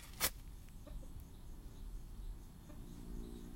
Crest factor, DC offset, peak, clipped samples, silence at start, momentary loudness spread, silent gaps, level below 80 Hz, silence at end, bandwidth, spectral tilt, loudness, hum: 26 dB; under 0.1%; -20 dBFS; under 0.1%; 0 s; 18 LU; none; -50 dBFS; 0 s; 16.5 kHz; -2.5 dB/octave; -48 LUFS; none